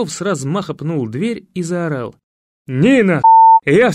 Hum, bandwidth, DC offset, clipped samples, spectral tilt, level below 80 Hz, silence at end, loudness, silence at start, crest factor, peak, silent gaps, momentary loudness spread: none; 11.5 kHz; under 0.1%; under 0.1%; -6 dB/octave; -54 dBFS; 0 s; -13 LUFS; 0 s; 12 dB; -2 dBFS; 2.23-2.65 s; 16 LU